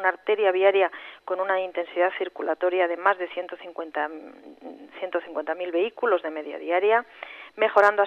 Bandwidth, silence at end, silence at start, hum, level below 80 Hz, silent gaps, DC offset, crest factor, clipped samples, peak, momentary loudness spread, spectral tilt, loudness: 7.8 kHz; 0 s; 0 s; none; -78 dBFS; none; under 0.1%; 20 dB; under 0.1%; -6 dBFS; 19 LU; -4.5 dB/octave; -25 LUFS